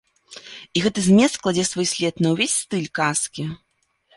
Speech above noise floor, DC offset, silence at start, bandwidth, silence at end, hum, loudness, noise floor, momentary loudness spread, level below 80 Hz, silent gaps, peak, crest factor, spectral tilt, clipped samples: 42 dB; under 0.1%; 0.3 s; 11.5 kHz; 0.6 s; none; -20 LUFS; -62 dBFS; 19 LU; -58 dBFS; none; -4 dBFS; 18 dB; -4 dB/octave; under 0.1%